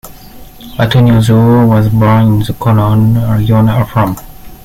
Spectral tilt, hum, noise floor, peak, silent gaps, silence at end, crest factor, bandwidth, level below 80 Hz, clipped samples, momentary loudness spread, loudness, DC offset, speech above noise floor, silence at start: -8 dB/octave; none; -31 dBFS; 0 dBFS; none; 0.1 s; 8 dB; 15.5 kHz; -32 dBFS; under 0.1%; 7 LU; -9 LUFS; under 0.1%; 23 dB; 0.05 s